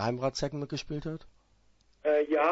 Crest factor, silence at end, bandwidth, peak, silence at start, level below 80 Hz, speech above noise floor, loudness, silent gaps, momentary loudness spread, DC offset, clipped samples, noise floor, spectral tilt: 18 dB; 0 s; 8 kHz; -14 dBFS; 0 s; -56 dBFS; 36 dB; -32 LUFS; none; 12 LU; under 0.1%; under 0.1%; -66 dBFS; -5.5 dB/octave